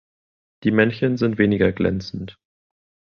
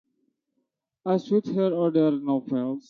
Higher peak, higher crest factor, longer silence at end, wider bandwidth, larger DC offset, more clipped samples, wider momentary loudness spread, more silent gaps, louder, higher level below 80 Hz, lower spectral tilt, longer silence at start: first, -2 dBFS vs -12 dBFS; first, 20 dB vs 14 dB; first, 0.75 s vs 0.1 s; about the same, 6.6 kHz vs 6.8 kHz; neither; neither; first, 14 LU vs 6 LU; neither; first, -20 LUFS vs -25 LUFS; first, -46 dBFS vs -76 dBFS; about the same, -8 dB/octave vs -9 dB/octave; second, 0.65 s vs 1.05 s